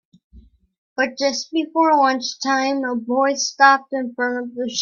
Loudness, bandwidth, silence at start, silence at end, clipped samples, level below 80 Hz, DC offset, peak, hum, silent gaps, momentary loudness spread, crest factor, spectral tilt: -19 LUFS; 7.4 kHz; 0.35 s; 0 s; under 0.1%; -60 dBFS; under 0.1%; 0 dBFS; none; 0.78-0.96 s; 10 LU; 20 dB; -1.5 dB/octave